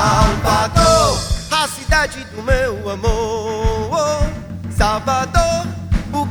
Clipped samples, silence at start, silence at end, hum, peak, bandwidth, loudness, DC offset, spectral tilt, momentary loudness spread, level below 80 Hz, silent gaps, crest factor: under 0.1%; 0 s; 0 s; none; 0 dBFS; over 20 kHz; -17 LUFS; under 0.1%; -4.5 dB/octave; 9 LU; -24 dBFS; none; 16 dB